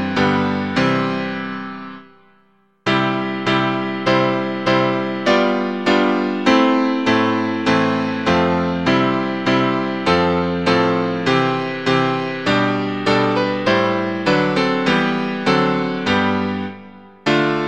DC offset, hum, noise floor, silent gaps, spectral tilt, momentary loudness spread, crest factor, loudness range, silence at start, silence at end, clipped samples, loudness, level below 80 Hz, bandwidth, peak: 0.4%; none; -58 dBFS; none; -6 dB/octave; 5 LU; 16 dB; 4 LU; 0 s; 0 s; under 0.1%; -18 LUFS; -50 dBFS; 9 kHz; -2 dBFS